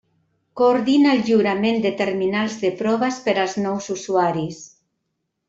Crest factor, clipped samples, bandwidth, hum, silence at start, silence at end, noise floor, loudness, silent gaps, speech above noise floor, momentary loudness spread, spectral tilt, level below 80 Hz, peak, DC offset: 16 dB; under 0.1%; 7.8 kHz; none; 0.55 s; 0.8 s; -76 dBFS; -20 LUFS; none; 57 dB; 10 LU; -5.5 dB/octave; -62 dBFS; -4 dBFS; under 0.1%